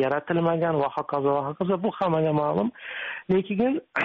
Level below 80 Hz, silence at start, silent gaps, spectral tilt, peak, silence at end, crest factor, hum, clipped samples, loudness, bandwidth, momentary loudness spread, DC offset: -62 dBFS; 0 s; none; -5.5 dB/octave; -12 dBFS; 0 s; 14 dB; none; under 0.1%; -25 LUFS; 5.8 kHz; 5 LU; under 0.1%